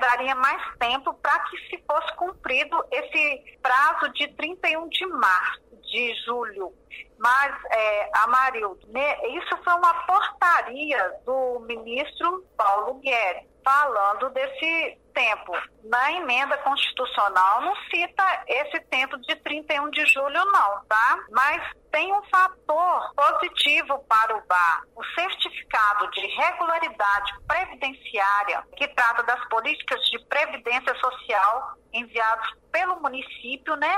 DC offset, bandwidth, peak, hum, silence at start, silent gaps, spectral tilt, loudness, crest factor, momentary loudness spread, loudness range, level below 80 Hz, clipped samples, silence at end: under 0.1%; 16 kHz; -10 dBFS; none; 0 s; none; -1.5 dB/octave; -23 LUFS; 14 dB; 9 LU; 3 LU; -60 dBFS; under 0.1%; 0 s